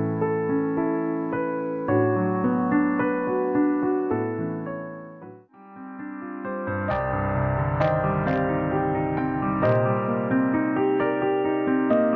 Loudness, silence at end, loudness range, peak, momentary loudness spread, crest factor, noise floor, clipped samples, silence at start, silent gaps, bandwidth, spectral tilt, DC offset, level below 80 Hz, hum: -24 LUFS; 0 s; 6 LU; -10 dBFS; 11 LU; 14 dB; -46 dBFS; under 0.1%; 0 s; none; 5 kHz; -10.5 dB/octave; under 0.1%; -46 dBFS; none